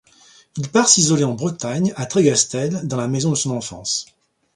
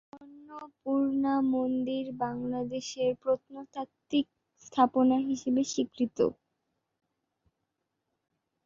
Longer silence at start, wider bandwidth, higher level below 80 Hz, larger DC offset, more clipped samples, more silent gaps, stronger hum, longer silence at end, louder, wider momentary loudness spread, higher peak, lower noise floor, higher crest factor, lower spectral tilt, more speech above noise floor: first, 0.55 s vs 0.15 s; first, 11.5 kHz vs 7.6 kHz; first, -58 dBFS vs -70 dBFS; neither; neither; neither; neither; second, 0.5 s vs 2.35 s; first, -18 LUFS vs -30 LUFS; second, 11 LU vs 15 LU; first, 0 dBFS vs -10 dBFS; second, -51 dBFS vs -83 dBFS; about the same, 20 dB vs 22 dB; about the same, -4 dB/octave vs -5 dB/octave; second, 32 dB vs 54 dB